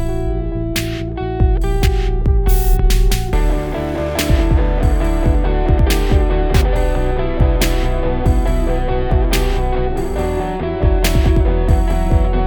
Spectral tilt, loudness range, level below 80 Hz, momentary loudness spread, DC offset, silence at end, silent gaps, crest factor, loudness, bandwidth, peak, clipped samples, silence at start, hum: -6 dB/octave; 2 LU; -16 dBFS; 5 LU; under 0.1%; 0 s; none; 14 dB; -17 LUFS; over 20 kHz; 0 dBFS; under 0.1%; 0 s; none